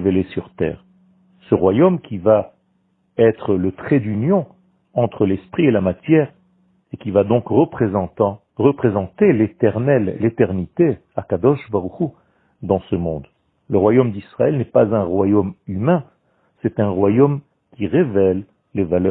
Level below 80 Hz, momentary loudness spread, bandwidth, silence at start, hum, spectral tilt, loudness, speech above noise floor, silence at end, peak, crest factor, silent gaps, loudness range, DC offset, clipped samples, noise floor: -50 dBFS; 10 LU; 4.1 kHz; 0 s; none; -13 dB/octave; -18 LUFS; 47 dB; 0 s; 0 dBFS; 18 dB; none; 2 LU; under 0.1%; under 0.1%; -63 dBFS